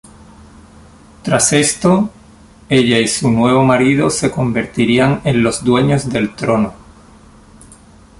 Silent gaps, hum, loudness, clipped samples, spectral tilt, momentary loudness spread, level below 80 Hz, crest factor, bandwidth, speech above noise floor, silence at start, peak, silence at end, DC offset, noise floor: none; none; -14 LUFS; under 0.1%; -5 dB/octave; 6 LU; -42 dBFS; 16 dB; 11.5 kHz; 29 dB; 1.25 s; 0 dBFS; 1.45 s; under 0.1%; -42 dBFS